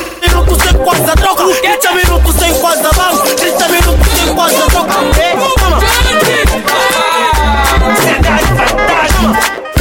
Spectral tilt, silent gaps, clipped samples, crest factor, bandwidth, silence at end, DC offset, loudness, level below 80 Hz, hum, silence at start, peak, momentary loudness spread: -3.5 dB/octave; none; under 0.1%; 8 dB; 17.5 kHz; 0 s; under 0.1%; -9 LUFS; -14 dBFS; none; 0 s; 0 dBFS; 2 LU